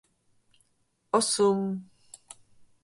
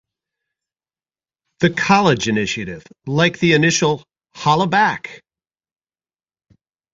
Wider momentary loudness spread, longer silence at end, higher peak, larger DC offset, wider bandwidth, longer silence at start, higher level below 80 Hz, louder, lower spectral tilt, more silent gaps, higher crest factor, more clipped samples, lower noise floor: first, 24 LU vs 14 LU; second, 1 s vs 1.75 s; second, -10 dBFS vs 0 dBFS; neither; first, 11.5 kHz vs 7.8 kHz; second, 1.15 s vs 1.6 s; second, -74 dBFS vs -54 dBFS; second, -26 LUFS vs -17 LUFS; about the same, -4 dB/octave vs -4.5 dB/octave; neither; about the same, 22 dB vs 20 dB; neither; second, -72 dBFS vs under -90 dBFS